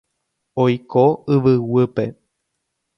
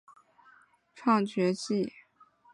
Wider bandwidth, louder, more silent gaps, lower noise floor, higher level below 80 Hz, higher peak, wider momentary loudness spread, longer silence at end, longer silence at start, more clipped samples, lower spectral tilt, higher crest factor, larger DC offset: second, 6 kHz vs 11 kHz; first, -18 LUFS vs -29 LUFS; neither; first, -75 dBFS vs -62 dBFS; first, -56 dBFS vs -78 dBFS; first, -2 dBFS vs -12 dBFS; first, 10 LU vs 7 LU; first, 0.85 s vs 0.65 s; second, 0.55 s vs 0.95 s; neither; first, -9.5 dB/octave vs -6 dB/octave; about the same, 18 dB vs 20 dB; neither